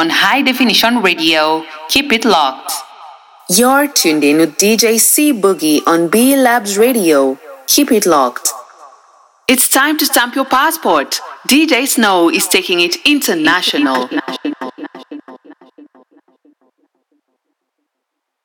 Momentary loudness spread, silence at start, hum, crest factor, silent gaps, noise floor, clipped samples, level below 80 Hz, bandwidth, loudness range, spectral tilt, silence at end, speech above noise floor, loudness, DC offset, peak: 11 LU; 0 s; none; 14 dB; none; -75 dBFS; under 0.1%; -56 dBFS; 19.5 kHz; 5 LU; -2 dB/octave; 2.9 s; 63 dB; -11 LUFS; under 0.1%; 0 dBFS